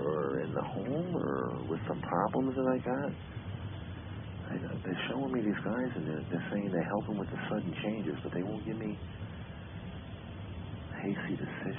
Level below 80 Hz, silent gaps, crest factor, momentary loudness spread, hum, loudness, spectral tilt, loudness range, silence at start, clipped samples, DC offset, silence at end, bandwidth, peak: -54 dBFS; none; 20 dB; 12 LU; none; -36 LUFS; -5 dB/octave; 6 LU; 0 s; under 0.1%; under 0.1%; 0 s; 3.7 kHz; -16 dBFS